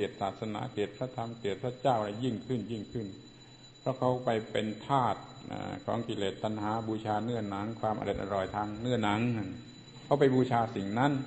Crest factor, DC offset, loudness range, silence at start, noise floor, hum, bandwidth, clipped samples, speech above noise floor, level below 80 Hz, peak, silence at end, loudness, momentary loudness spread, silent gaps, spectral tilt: 20 dB; under 0.1%; 4 LU; 0 s; -54 dBFS; none; 8.4 kHz; under 0.1%; 22 dB; -60 dBFS; -12 dBFS; 0 s; -33 LUFS; 11 LU; none; -7 dB/octave